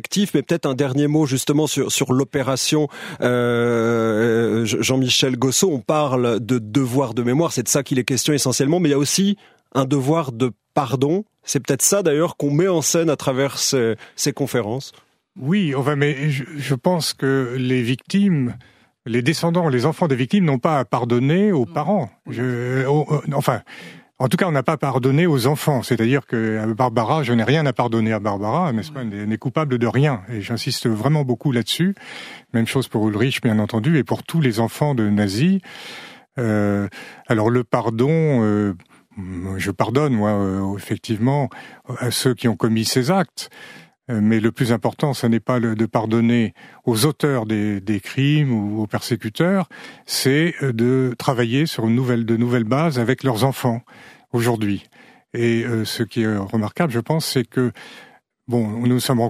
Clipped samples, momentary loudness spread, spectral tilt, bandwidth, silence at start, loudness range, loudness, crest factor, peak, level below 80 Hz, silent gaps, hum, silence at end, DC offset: under 0.1%; 8 LU; -5.5 dB/octave; 15.5 kHz; 0.1 s; 3 LU; -20 LUFS; 18 dB; 0 dBFS; -60 dBFS; none; none; 0 s; under 0.1%